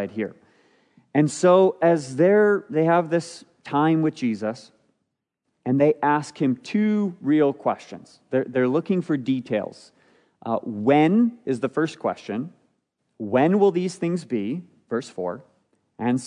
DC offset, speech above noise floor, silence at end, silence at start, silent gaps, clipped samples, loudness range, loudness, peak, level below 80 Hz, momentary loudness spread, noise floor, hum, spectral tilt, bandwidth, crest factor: under 0.1%; 57 dB; 0 s; 0 s; none; under 0.1%; 5 LU; -22 LUFS; -6 dBFS; -76 dBFS; 15 LU; -78 dBFS; none; -7 dB/octave; 10.5 kHz; 18 dB